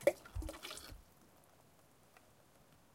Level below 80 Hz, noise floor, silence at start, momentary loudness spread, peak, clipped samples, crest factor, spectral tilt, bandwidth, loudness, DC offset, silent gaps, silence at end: -56 dBFS; -68 dBFS; 0 s; 20 LU; -16 dBFS; under 0.1%; 30 dB; -4.5 dB/octave; 16.5 kHz; -45 LUFS; under 0.1%; none; 1.9 s